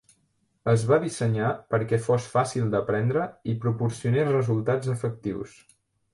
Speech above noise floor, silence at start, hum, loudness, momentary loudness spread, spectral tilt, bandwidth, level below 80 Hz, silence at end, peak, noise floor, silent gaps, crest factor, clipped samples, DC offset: 46 dB; 0.65 s; none; -26 LUFS; 7 LU; -7 dB/octave; 11.5 kHz; -58 dBFS; 0.65 s; -8 dBFS; -70 dBFS; none; 18 dB; under 0.1%; under 0.1%